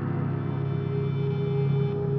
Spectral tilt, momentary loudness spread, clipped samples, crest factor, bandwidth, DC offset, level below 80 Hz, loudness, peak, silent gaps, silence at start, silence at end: -9 dB/octave; 3 LU; under 0.1%; 12 dB; 4.5 kHz; under 0.1%; -54 dBFS; -27 LUFS; -14 dBFS; none; 0 s; 0 s